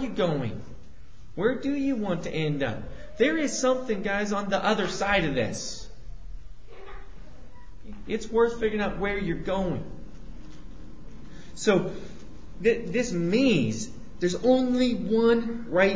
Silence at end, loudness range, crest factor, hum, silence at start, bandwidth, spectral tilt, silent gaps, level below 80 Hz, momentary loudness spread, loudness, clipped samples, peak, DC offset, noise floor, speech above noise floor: 0 s; 7 LU; 18 dB; none; 0 s; 8 kHz; -5 dB/octave; none; -46 dBFS; 24 LU; -26 LUFS; under 0.1%; -8 dBFS; 1%; -49 dBFS; 23 dB